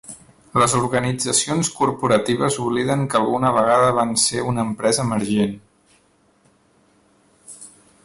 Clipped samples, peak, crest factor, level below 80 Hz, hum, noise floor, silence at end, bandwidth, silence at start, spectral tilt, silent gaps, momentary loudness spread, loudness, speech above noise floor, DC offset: under 0.1%; -4 dBFS; 16 dB; -52 dBFS; none; -59 dBFS; 0.4 s; 12 kHz; 0.1 s; -4 dB/octave; none; 8 LU; -19 LUFS; 40 dB; under 0.1%